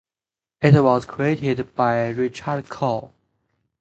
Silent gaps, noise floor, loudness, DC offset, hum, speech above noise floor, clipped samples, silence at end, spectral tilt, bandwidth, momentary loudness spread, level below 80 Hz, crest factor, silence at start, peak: none; under -90 dBFS; -21 LUFS; under 0.1%; none; over 70 dB; under 0.1%; 0.75 s; -8 dB/octave; 8 kHz; 11 LU; -54 dBFS; 20 dB; 0.6 s; -2 dBFS